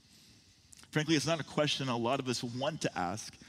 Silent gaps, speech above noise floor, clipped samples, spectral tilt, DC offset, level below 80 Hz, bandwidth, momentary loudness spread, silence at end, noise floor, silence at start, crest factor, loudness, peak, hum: none; 28 dB; under 0.1%; -4.5 dB/octave; under 0.1%; -70 dBFS; 15.5 kHz; 6 LU; 0.05 s; -62 dBFS; 0.8 s; 20 dB; -33 LUFS; -16 dBFS; none